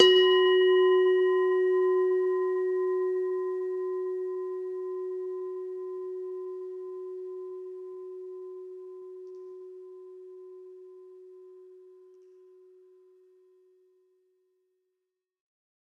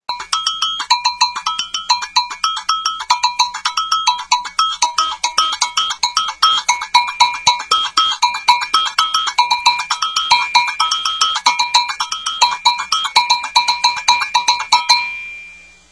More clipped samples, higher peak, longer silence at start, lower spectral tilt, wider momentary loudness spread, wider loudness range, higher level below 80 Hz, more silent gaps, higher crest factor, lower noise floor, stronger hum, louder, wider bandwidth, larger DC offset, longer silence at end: neither; second, -4 dBFS vs 0 dBFS; about the same, 0 s vs 0.1 s; first, -3 dB/octave vs 3 dB/octave; first, 25 LU vs 5 LU; first, 24 LU vs 3 LU; second, -86 dBFS vs -56 dBFS; neither; first, 24 dB vs 16 dB; first, -85 dBFS vs -39 dBFS; neither; second, -27 LUFS vs -15 LUFS; second, 6.8 kHz vs 11 kHz; neither; first, 4.1 s vs 0.35 s